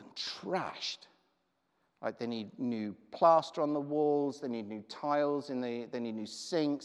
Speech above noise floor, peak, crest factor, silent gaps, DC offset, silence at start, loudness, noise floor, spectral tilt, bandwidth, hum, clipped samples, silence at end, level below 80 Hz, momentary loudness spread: 45 dB; -14 dBFS; 20 dB; none; under 0.1%; 0 s; -34 LUFS; -78 dBFS; -5 dB/octave; 11 kHz; none; under 0.1%; 0 s; -88 dBFS; 12 LU